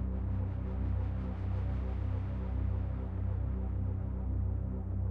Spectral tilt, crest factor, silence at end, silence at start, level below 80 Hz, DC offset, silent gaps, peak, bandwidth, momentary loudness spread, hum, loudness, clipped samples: -11 dB/octave; 10 dB; 0 s; 0 s; -38 dBFS; under 0.1%; none; -24 dBFS; 3.6 kHz; 2 LU; none; -36 LUFS; under 0.1%